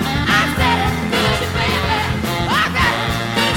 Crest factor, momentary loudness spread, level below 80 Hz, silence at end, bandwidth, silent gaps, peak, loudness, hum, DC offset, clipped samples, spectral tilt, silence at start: 14 dB; 4 LU; -30 dBFS; 0 s; 17.5 kHz; none; -4 dBFS; -16 LUFS; none; under 0.1%; under 0.1%; -4.5 dB/octave; 0 s